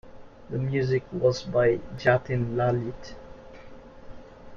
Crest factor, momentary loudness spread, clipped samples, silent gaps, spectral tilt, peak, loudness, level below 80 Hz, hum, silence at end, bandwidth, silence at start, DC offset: 20 dB; 23 LU; under 0.1%; none; -7 dB/octave; -6 dBFS; -26 LUFS; -50 dBFS; none; 0 s; 7.2 kHz; 0.05 s; under 0.1%